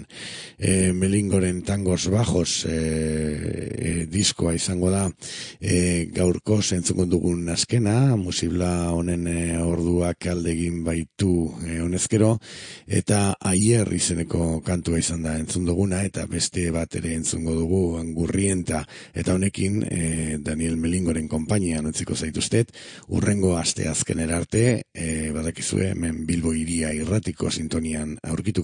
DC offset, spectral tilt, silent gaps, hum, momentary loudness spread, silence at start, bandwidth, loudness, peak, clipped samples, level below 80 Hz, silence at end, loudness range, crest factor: under 0.1%; -5 dB/octave; none; none; 7 LU; 0 s; 10.5 kHz; -23 LUFS; -6 dBFS; under 0.1%; -44 dBFS; 0 s; 3 LU; 18 dB